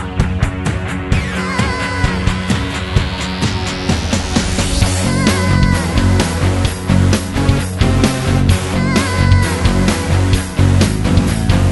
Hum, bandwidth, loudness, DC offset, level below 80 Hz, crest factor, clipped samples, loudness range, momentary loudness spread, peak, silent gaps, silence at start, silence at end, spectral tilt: none; 12 kHz; -15 LUFS; under 0.1%; -22 dBFS; 14 dB; under 0.1%; 3 LU; 5 LU; 0 dBFS; none; 0 s; 0 s; -5.5 dB/octave